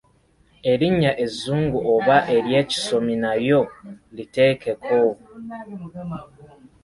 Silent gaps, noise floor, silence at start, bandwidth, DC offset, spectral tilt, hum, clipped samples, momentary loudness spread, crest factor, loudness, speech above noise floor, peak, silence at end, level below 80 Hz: none; -59 dBFS; 0.65 s; 11.5 kHz; under 0.1%; -6 dB/octave; none; under 0.1%; 18 LU; 18 dB; -20 LUFS; 38 dB; -2 dBFS; 0.4 s; -52 dBFS